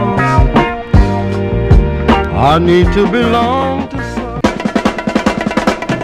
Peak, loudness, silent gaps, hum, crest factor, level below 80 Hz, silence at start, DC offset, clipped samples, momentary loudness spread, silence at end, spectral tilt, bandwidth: 0 dBFS; -13 LUFS; none; none; 12 dB; -18 dBFS; 0 s; under 0.1%; 0.3%; 6 LU; 0 s; -7 dB/octave; 12 kHz